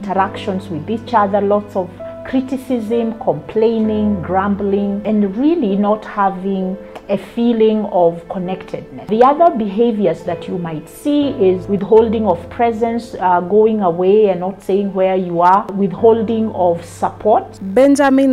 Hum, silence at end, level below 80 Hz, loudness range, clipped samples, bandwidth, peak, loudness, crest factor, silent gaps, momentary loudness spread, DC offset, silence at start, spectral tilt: none; 0 s; -48 dBFS; 4 LU; under 0.1%; 13 kHz; 0 dBFS; -15 LUFS; 14 dB; none; 11 LU; under 0.1%; 0 s; -7.5 dB/octave